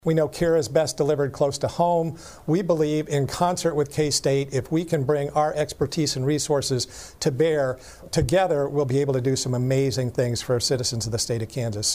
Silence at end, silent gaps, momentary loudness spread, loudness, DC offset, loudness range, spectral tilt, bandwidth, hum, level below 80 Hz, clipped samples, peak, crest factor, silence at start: 0 s; none; 5 LU; -23 LUFS; 0.1%; 1 LU; -5 dB/octave; 15.5 kHz; none; -48 dBFS; under 0.1%; -6 dBFS; 18 dB; 0.05 s